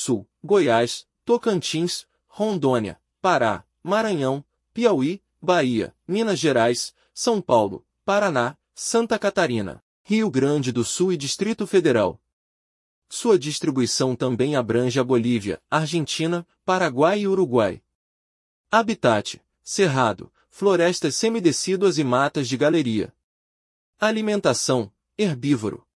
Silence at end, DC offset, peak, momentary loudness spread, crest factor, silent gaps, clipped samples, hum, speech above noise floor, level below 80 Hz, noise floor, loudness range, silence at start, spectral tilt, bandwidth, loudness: 0.2 s; under 0.1%; -4 dBFS; 8 LU; 18 dB; 9.82-10.04 s, 12.33-13.02 s, 17.95-18.64 s, 23.23-23.93 s; under 0.1%; none; over 69 dB; -64 dBFS; under -90 dBFS; 2 LU; 0 s; -4.5 dB/octave; 12 kHz; -22 LUFS